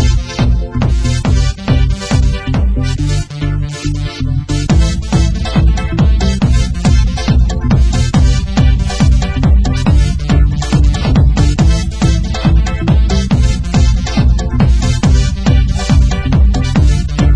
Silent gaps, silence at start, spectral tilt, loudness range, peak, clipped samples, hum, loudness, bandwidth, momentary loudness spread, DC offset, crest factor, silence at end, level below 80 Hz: none; 0 s; -6 dB/octave; 3 LU; 0 dBFS; under 0.1%; none; -13 LUFS; 10.5 kHz; 4 LU; 0.4%; 10 dB; 0 s; -12 dBFS